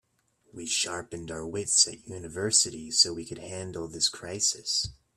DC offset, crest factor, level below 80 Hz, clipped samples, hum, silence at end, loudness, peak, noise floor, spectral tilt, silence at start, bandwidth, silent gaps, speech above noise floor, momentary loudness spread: under 0.1%; 24 dB; -60 dBFS; under 0.1%; none; 0.25 s; -26 LUFS; -8 dBFS; -69 dBFS; -1 dB/octave; 0.55 s; 15.5 kHz; none; 39 dB; 16 LU